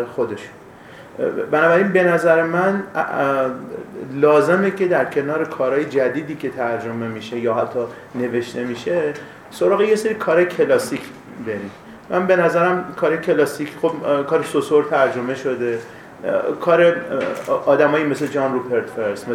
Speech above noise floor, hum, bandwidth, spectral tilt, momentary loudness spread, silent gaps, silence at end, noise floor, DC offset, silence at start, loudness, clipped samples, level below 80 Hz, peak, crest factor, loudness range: 22 dB; none; 15.5 kHz; -6 dB/octave; 13 LU; none; 0 s; -40 dBFS; under 0.1%; 0 s; -19 LUFS; under 0.1%; -62 dBFS; -2 dBFS; 18 dB; 4 LU